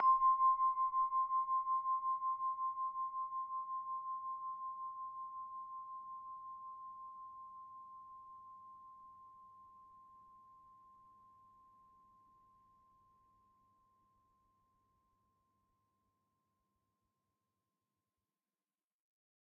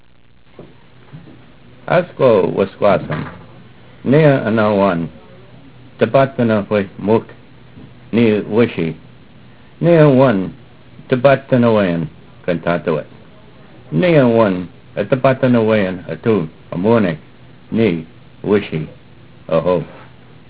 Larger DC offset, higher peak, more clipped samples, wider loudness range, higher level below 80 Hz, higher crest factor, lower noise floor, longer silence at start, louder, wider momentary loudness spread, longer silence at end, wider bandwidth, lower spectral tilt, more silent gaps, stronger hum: second, under 0.1% vs 0.6%; second, -22 dBFS vs 0 dBFS; neither; first, 24 LU vs 4 LU; second, -80 dBFS vs -48 dBFS; about the same, 20 dB vs 16 dB; first, under -90 dBFS vs -50 dBFS; second, 0 s vs 0.6 s; second, -38 LUFS vs -15 LUFS; first, 23 LU vs 14 LU; first, 8.65 s vs 0.45 s; second, 2.2 kHz vs 4 kHz; second, 1 dB/octave vs -11.5 dB/octave; neither; neither